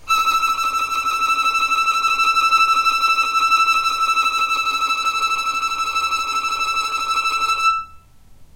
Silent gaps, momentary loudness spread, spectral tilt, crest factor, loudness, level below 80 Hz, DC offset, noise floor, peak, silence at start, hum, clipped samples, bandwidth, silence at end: none; 5 LU; 1 dB/octave; 14 dB; -17 LUFS; -50 dBFS; under 0.1%; -44 dBFS; -4 dBFS; 0 s; none; under 0.1%; 16 kHz; 0.1 s